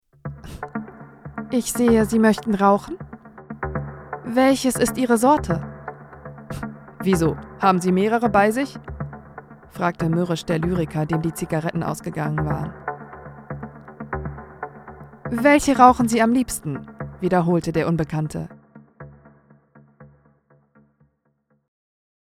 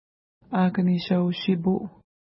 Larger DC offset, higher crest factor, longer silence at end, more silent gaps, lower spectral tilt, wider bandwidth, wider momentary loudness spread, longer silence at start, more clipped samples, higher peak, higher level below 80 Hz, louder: neither; first, 22 dB vs 14 dB; first, 2.3 s vs 0.45 s; neither; second, -6 dB/octave vs -11.5 dB/octave; first, 16 kHz vs 5.8 kHz; first, 21 LU vs 7 LU; second, 0.25 s vs 0.5 s; neither; first, 0 dBFS vs -10 dBFS; first, -44 dBFS vs -62 dBFS; first, -21 LUFS vs -24 LUFS